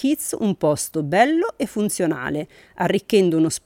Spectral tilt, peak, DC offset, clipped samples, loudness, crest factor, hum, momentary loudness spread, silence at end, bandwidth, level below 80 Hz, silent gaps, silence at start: -5 dB/octave; -4 dBFS; under 0.1%; under 0.1%; -21 LUFS; 16 dB; none; 8 LU; 0.1 s; 17 kHz; -56 dBFS; none; 0 s